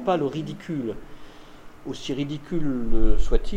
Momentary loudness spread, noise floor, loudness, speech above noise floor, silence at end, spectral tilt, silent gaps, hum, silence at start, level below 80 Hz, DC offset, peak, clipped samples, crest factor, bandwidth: 21 LU; -43 dBFS; -28 LUFS; 23 dB; 0 s; -7 dB/octave; none; none; 0 s; -26 dBFS; under 0.1%; -4 dBFS; under 0.1%; 16 dB; 7.4 kHz